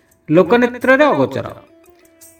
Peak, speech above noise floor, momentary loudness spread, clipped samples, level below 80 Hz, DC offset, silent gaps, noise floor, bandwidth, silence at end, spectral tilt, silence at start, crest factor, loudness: 0 dBFS; 35 dB; 12 LU; under 0.1%; -56 dBFS; under 0.1%; none; -48 dBFS; 18 kHz; 0.8 s; -6.5 dB/octave; 0.3 s; 16 dB; -14 LUFS